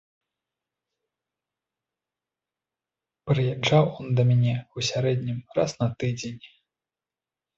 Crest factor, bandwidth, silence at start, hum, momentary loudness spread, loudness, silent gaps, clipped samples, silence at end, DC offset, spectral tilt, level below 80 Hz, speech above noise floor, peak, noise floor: 20 dB; 7.8 kHz; 3.25 s; none; 11 LU; -25 LUFS; none; under 0.1%; 1.1 s; under 0.1%; -6 dB/octave; -60 dBFS; over 66 dB; -8 dBFS; under -90 dBFS